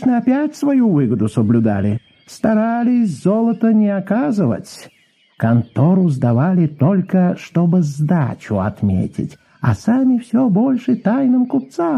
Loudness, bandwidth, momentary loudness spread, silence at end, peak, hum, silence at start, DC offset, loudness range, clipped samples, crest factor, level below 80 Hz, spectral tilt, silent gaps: -16 LUFS; 11.5 kHz; 6 LU; 0 s; -4 dBFS; none; 0 s; under 0.1%; 2 LU; under 0.1%; 12 dB; -44 dBFS; -9 dB/octave; none